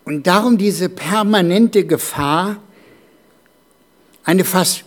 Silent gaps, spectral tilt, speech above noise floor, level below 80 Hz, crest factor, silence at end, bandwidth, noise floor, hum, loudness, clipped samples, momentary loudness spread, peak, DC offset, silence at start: none; -4.5 dB/octave; 39 dB; -56 dBFS; 16 dB; 0.05 s; 19 kHz; -54 dBFS; none; -15 LUFS; under 0.1%; 8 LU; 0 dBFS; under 0.1%; 0.05 s